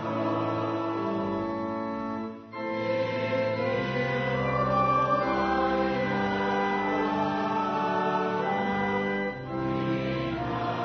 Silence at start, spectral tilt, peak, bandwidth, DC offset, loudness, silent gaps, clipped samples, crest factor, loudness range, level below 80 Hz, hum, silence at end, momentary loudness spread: 0 s; -7.5 dB/octave; -14 dBFS; 6.6 kHz; under 0.1%; -28 LUFS; none; under 0.1%; 14 dB; 4 LU; -52 dBFS; none; 0 s; 6 LU